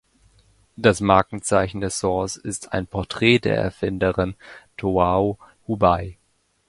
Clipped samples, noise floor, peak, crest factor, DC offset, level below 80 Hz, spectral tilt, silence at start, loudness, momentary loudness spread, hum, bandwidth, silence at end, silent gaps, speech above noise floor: under 0.1%; -66 dBFS; 0 dBFS; 22 dB; under 0.1%; -42 dBFS; -5 dB/octave; 0.8 s; -21 LUFS; 12 LU; none; 11.5 kHz; 0.55 s; none; 45 dB